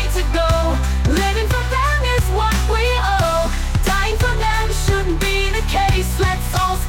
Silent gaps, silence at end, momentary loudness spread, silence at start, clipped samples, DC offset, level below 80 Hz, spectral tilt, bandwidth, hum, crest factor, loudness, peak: none; 0 s; 2 LU; 0 s; under 0.1%; under 0.1%; -20 dBFS; -4.5 dB/octave; 17 kHz; none; 10 dB; -18 LUFS; -6 dBFS